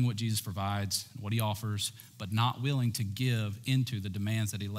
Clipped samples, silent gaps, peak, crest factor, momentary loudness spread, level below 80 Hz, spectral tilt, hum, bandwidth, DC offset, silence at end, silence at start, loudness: under 0.1%; none; -16 dBFS; 16 dB; 5 LU; -70 dBFS; -5 dB/octave; none; 16 kHz; under 0.1%; 0 s; 0 s; -32 LUFS